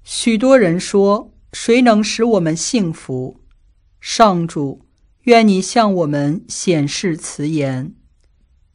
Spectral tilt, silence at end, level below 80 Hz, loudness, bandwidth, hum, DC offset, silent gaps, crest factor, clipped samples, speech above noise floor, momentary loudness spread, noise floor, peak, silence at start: -5 dB/octave; 0.85 s; -50 dBFS; -15 LUFS; 11 kHz; none; under 0.1%; none; 16 dB; under 0.1%; 39 dB; 14 LU; -54 dBFS; 0 dBFS; 0.1 s